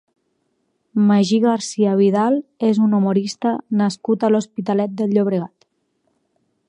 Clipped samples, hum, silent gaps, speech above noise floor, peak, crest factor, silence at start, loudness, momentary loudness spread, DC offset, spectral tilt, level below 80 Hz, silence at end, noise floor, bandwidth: under 0.1%; none; none; 52 dB; -4 dBFS; 14 dB; 0.95 s; -18 LUFS; 6 LU; under 0.1%; -6.5 dB/octave; -72 dBFS; 1.2 s; -69 dBFS; 10.5 kHz